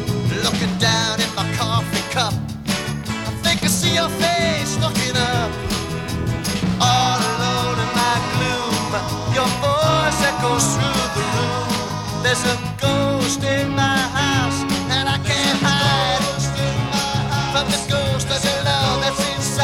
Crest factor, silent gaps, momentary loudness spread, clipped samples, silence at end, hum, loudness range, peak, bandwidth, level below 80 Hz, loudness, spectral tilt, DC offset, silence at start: 16 dB; none; 6 LU; under 0.1%; 0 s; none; 2 LU; -4 dBFS; 17 kHz; -38 dBFS; -19 LUFS; -4 dB/octave; under 0.1%; 0 s